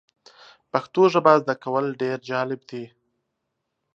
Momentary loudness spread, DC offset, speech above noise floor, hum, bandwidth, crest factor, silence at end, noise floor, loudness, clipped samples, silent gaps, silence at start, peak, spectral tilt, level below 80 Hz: 18 LU; under 0.1%; 57 dB; none; 7.4 kHz; 22 dB; 1.1 s; -79 dBFS; -22 LUFS; under 0.1%; none; 0.75 s; -2 dBFS; -6.5 dB/octave; -76 dBFS